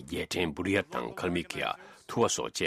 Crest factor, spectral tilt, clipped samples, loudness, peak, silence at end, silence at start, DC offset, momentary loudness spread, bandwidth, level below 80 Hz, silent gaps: 20 dB; -3.5 dB/octave; under 0.1%; -31 LUFS; -12 dBFS; 0 s; 0 s; under 0.1%; 7 LU; 15.5 kHz; -58 dBFS; none